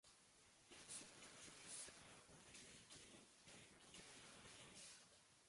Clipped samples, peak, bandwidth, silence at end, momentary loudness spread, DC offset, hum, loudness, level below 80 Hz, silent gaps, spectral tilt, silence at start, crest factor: under 0.1%; -42 dBFS; 11.5 kHz; 0 s; 10 LU; under 0.1%; none; -60 LUFS; -84 dBFS; none; -1.5 dB/octave; 0.05 s; 20 dB